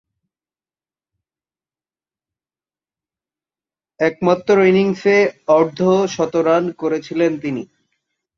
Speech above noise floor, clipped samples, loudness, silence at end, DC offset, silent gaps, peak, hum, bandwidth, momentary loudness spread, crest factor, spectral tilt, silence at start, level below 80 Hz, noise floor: over 74 dB; under 0.1%; -16 LUFS; 0.75 s; under 0.1%; none; -2 dBFS; none; 7.4 kHz; 8 LU; 18 dB; -6.5 dB/octave; 4 s; -62 dBFS; under -90 dBFS